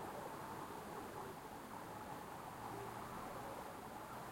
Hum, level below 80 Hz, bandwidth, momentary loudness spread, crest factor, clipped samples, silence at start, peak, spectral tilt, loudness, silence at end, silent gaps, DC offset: none; -70 dBFS; 16.5 kHz; 2 LU; 14 dB; under 0.1%; 0 s; -36 dBFS; -4.5 dB/octave; -50 LUFS; 0 s; none; under 0.1%